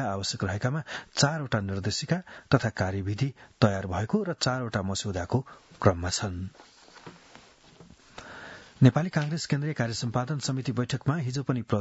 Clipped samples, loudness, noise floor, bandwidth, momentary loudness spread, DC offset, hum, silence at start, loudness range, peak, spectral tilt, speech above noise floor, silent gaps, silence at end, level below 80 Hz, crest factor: under 0.1%; -28 LUFS; -54 dBFS; 8 kHz; 18 LU; under 0.1%; none; 0 s; 4 LU; -2 dBFS; -5.5 dB/octave; 26 dB; none; 0 s; -58 dBFS; 26 dB